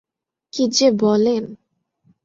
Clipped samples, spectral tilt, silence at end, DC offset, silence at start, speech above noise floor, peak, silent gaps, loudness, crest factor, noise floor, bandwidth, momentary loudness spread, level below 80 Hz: under 0.1%; -4.5 dB/octave; 0.7 s; under 0.1%; 0.55 s; 46 dB; -4 dBFS; none; -17 LUFS; 16 dB; -63 dBFS; 7.8 kHz; 15 LU; -62 dBFS